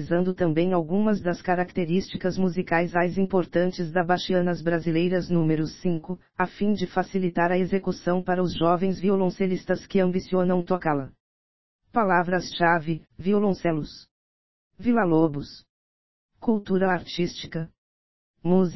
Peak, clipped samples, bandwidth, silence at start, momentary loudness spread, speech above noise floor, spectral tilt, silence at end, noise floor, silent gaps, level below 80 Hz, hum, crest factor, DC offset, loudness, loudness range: -6 dBFS; under 0.1%; 6 kHz; 0 s; 7 LU; over 66 dB; -7.5 dB/octave; 0 s; under -90 dBFS; 11.20-11.79 s, 14.11-14.71 s, 15.69-16.29 s, 17.78-18.34 s; -54 dBFS; none; 18 dB; 1%; -25 LUFS; 2 LU